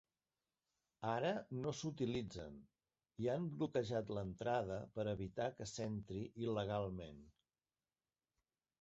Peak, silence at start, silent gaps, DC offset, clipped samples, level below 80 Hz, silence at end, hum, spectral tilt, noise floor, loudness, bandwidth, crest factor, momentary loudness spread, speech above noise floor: -26 dBFS; 1 s; none; under 0.1%; under 0.1%; -68 dBFS; 1.5 s; none; -6 dB/octave; under -90 dBFS; -43 LUFS; 8 kHz; 18 dB; 11 LU; over 47 dB